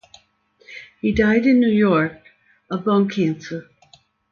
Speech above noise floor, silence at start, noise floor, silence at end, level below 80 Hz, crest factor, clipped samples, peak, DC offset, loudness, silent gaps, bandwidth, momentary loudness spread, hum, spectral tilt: 41 dB; 0.7 s; -58 dBFS; 0.7 s; -46 dBFS; 16 dB; under 0.1%; -4 dBFS; under 0.1%; -19 LUFS; none; 7 kHz; 19 LU; none; -7.5 dB/octave